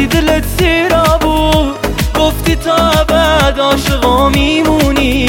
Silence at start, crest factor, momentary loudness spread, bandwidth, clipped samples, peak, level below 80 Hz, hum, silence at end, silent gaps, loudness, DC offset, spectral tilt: 0 s; 10 dB; 3 LU; 17 kHz; under 0.1%; 0 dBFS; -18 dBFS; none; 0 s; none; -11 LUFS; under 0.1%; -5 dB/octave